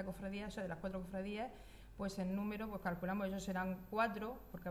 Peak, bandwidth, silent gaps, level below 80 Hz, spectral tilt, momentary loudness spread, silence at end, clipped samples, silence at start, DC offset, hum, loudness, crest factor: -24 dBFS; 13.5 kHz; none; -60 dBFS; -6.5 dB/octave; 9 LU; 0 s; under 0.1%; 0 s; under 0.1%; none; -43 LUFS; 18 dB